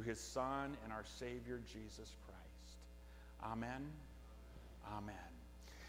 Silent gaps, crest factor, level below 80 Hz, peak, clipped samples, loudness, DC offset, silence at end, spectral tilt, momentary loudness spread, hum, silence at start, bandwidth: none; 22 dB; -60 dBFS; -28 dBFS; under 0.1%; -50 LUFS; under 0.1%; 0 s; -5 dB/octave; 16 LU; none; 0 s; 18 kHz